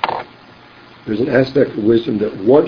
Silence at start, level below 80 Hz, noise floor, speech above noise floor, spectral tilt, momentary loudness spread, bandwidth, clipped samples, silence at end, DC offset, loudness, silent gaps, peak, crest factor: 0 s; -50 dBFS; -42 dBFS; 28 dB; -8.5 dB/octave; 15 LU; 5.4 kHz; under 0.1%; 0 s; under 0.1%; -16 LUFS; none; 0 dBFS; 16 dB